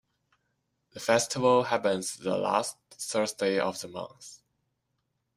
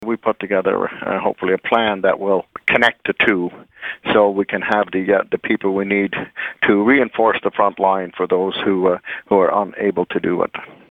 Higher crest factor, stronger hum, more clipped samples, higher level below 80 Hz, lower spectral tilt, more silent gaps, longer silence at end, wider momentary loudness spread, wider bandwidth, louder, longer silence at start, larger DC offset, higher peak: about the same, 22 dB vs 18 dB; neither; neither; second, -72 dBFS vs -56 dBFS; second, -3.5 dB/octave vs -7 dB/octave; neither; first, 1 s vs 0.15 s; first, 16 LU vs 7 LU; first, 15.5 kHz vs 8.8 kHz; second, -28 LUFS vs -18 LUFS; first, 0.95 s vs 0 s; neither; second, -8 dBFS vs 0 dBFS